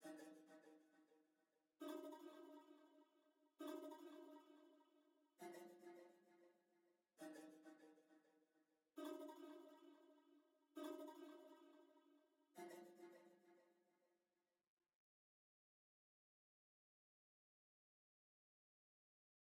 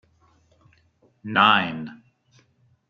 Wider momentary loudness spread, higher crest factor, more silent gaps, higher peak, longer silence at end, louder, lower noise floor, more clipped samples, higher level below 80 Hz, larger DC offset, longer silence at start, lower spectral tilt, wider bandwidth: second, 12 LU vs 23 LU; about the same, 22 dB vs 24 dB; neither; second, -42 dBFS vs -2 dBFS; first, 5.5 s vs 0.95 s; second, -60 LUFS vs -19 LUFS; first, under -90 dBFS vs -62 dBFS; neither; second, under -90 dBFS vs -70 dBFS; neither; second, 0 s vs 1.25 s; second, -4 dB/octave vs -5.5 dB/octave; first, 17.5 kHz vs 7.4 kHz